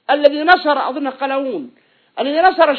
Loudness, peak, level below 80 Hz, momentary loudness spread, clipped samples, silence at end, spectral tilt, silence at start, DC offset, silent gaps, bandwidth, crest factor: -16 LUFS; 0 dBFS; -58 dBFS; 12 LU; 0.2%; 0 s; -5.5 dB/octave; 0.1 s; under 0.1%; none; 5.4 kHz; 16 dB